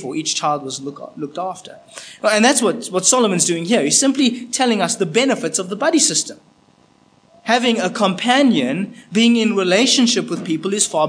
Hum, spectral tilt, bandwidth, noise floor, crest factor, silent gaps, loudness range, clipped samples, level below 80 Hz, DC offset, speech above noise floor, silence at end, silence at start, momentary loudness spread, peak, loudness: none; -2.5 dB/octave; 10.5 kHz; -54 dBFS; 18 dB; none; 3 LU; under 0.1%; -72 dBFS; under 0.1%; 36 dB; 0 s; 0 s; 14 LU; 0 dBFS; -16 LUFS